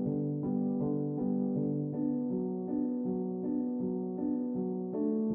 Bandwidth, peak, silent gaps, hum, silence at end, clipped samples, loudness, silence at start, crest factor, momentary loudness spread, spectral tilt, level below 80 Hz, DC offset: 1.9 kHz; -22 dBFS; none; none; 0 s; under 0.1%; -34 LUFS; 0 s; 12 dB; 3 LU; -12.5 dB/octave; -68 dBFS; under 0.1%